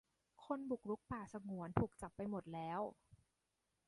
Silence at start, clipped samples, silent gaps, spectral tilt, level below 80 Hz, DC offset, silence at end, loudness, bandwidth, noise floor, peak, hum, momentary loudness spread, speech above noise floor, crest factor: 0.4 s; under 0.1%; none; -8 dB/octave; -66 dBFS; under 0.1%; 0.75 s; -46 LUFS; 11.5 kHz; -87 dBFS; -20 dBFS; none; 7 LU; 42 dB; 26 dB